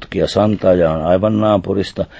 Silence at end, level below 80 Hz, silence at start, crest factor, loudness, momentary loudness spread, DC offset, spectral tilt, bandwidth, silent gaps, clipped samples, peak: 0 s; -36 dBFS; 0 s; 12 dB; -15 LUFS; 5 LU; under 0.1%; -7.5 dB/octave; 8 kHz; none; under 0.1%; -2 dBFS